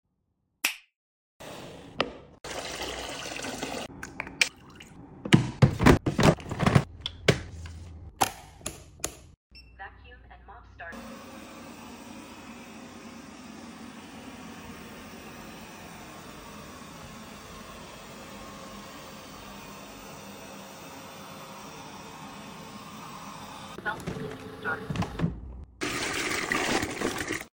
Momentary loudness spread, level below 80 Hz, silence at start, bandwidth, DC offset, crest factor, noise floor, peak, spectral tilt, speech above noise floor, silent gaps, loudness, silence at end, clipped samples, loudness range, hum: 20 LU; -48 dBFS; 0.65 s; 17 kHz; under 0.1%; 28 dB; -76 dBFS; -4 dBFS; -4.5 dB/octave; 43 dB; 0.96-1.40 s, 9.37-9.50 s; -29 LUFS; 0.05 s; under 0.1%; 19 LU; none